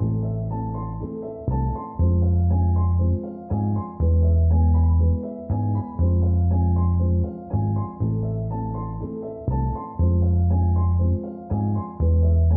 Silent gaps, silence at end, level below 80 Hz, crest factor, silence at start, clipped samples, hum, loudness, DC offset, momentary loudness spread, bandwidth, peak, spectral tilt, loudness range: none; 0 s; -28 dBFS; 10 dB; 0 s; under 0.1%; none; -23 LUFS; under 0.1%; 10 LU; 1.8 kHz; -10 dBFS; -16 dB/octave; 4 LU